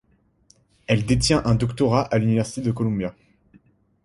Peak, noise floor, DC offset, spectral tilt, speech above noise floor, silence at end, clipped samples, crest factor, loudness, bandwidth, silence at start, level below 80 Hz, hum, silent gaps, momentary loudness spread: -4 dBFS; -59 dBFS; under 0.1%; -6 dB/octave; 39 dB; 0.95 s; under 0.1%; 18 dB; -22 LUFS; 11.5 kHz; 0.9 s; -42 dBFS; none; none; 8 LU